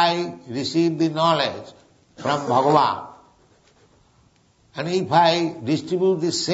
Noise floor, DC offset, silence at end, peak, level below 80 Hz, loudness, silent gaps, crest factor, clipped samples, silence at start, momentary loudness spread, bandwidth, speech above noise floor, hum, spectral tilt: -59 dBFS; under 0.1%; 0 s; -2 dBFS; -64 dBFS; -21 LUFS; none; 20 dB; under 0.1%; 0 s; 13 LU; 8 kHz; 38 dB; none; -5 dB/octave